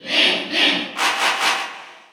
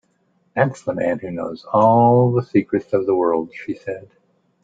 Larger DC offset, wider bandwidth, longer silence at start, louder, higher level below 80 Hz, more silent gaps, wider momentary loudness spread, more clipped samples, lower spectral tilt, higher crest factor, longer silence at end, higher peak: neither; first, over 20 kHz vs 7.8 kHz; second, 0 s vs 0.55 s; about the same, -17 LUFS vs -19 LUFS; second, -84 dBFS vs -60 dBFS; neither; second, 10 LU vs 16 LU; neither; second, -0.5 dB/octave vs -9 dB/octave; about the same, 16 dB vs 18 dB; second, 0.15 s vs 0.65 s; about the same, -4 dBFS vs -2 dBFS